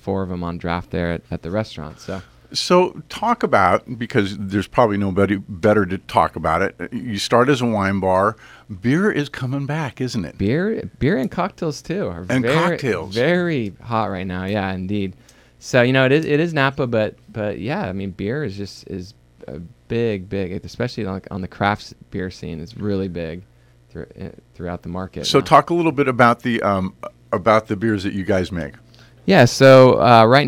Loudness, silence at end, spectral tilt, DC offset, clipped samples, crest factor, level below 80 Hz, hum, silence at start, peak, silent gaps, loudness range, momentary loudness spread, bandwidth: -19 LUFS; 0 s; -6 dB/octave; under 0.1%; under 0.1%; 18 dB; -46 dBFS; none; 0.05 s; 0 dBFS; none; 8 LU; 16 LU; 16 kHz